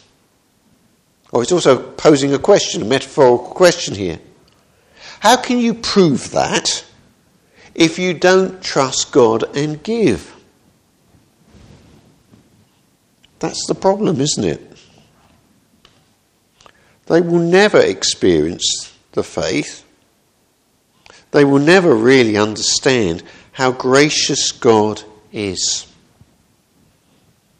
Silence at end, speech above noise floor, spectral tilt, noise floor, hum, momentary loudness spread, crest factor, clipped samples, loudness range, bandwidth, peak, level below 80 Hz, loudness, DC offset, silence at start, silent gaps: 1.75 s; 45 dB; -4 dB/octave; -59 dBFS; none; 12 LU; 16 dB; under 0.1%; 8 LU; 12.5 kHz; 0 dBFS; -50 dBFS; -14 LUFS; under 0.1%; 1.35 s; none